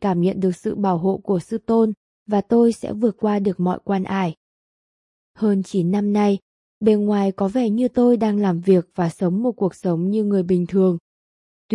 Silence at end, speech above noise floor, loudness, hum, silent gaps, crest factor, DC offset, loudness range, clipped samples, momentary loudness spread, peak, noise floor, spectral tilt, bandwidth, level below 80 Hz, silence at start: 0 s; over 71 dB; -20 LUFS; none; 1.97-2.26 s, 4.37-5.34 s, 6.42-6.81 s, 11.00-11.69 s; 16 dB; under 0.1%; 3 LU; under 0.1%; 6 LU; -4 dBFS; under -90 dBFS; -8.5 dB/octave; 11.5 kHz; -58 dBFS; 0 s